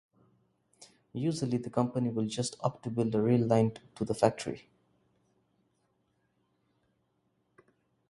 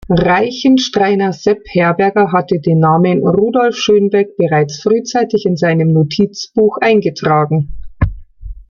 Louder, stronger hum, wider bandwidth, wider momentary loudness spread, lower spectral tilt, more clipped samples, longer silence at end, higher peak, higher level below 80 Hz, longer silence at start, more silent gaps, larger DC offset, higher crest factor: second, -31 LUFS vs -13 LUFS; neither; first, 11.5 kHz vs 7.2 kHz; first, 12 LU vs 5 LU; about the same, -6.5 dB/octave vs -6.5 dB/octave; neither; first, 3.5 s vs 0.05 s; second, -8 dBFS vs -2 dBFS; second, -66 dBFS vs -34 dBFS; first, 0.8 s vs 0.1 s; neither; neither; first, 26 dB vs 12 dB